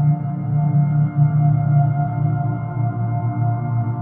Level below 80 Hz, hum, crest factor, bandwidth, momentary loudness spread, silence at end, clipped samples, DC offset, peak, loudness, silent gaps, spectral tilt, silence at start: -48 dBFS; none; 12 dB; 2.3 kHz; 6 LU; 0 s; under 0.1%; under 0.1%; -6 dBFS; -19 LUFS; none; -14.5 dB/octave; 0 s